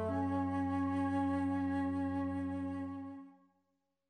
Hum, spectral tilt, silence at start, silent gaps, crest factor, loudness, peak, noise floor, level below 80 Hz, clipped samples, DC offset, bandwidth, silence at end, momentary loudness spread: none; -8.5 dB/octave; 0 s; none; 12 dB; -37 LUFS; -24 dBFS; -83 dBFS; -64 dBFS; under 0.1%; under 0.1%; 9.2 kHz; 0.8 s; 9 LU